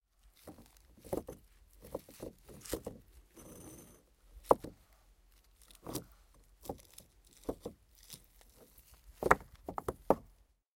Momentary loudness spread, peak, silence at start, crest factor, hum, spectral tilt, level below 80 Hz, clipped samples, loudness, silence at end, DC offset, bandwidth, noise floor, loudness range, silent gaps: 28 LU; -6 dBFS; 0.45 s; 36 dB; none; -5 dB/octave; -60 dBFS; under 0.1%; -38 LUFS; 0.55 s; under 0.1%; 17 kHz; -66 dBFS; 11 LU; none